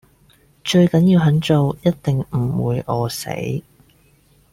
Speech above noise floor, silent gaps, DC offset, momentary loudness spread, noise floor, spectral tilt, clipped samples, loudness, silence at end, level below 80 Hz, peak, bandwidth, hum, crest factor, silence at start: 38 dB; none; under 0.1%; 11 LU; -55 dBFS; -7 dB/octave; under 0.1%; -18 LUFS; 0.9 s; -48 dBFS; -4 dBFS; 15.5 kHz; none; 16 dB; 0.65 s